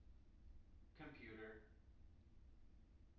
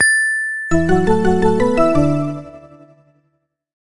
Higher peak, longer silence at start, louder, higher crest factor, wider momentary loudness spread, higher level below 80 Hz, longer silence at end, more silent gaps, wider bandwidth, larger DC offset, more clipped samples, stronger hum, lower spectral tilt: second, -44 dBFS vs -2 dBFS; about the same, 0 s vs 0 s; second, -61 LUFS vs -16 LUFS; about the same, 18 dB vs 14 dB; first, 12 LU vs 6 LU; second, -68 dBFS vs -36 dBFS; second, 0 s vs 1.3 s; neither; second, 5.8 kHz vs 11.5 kHz; neither; neither; neither; about the same, -5 dB/octave vs -5.5 dB/octave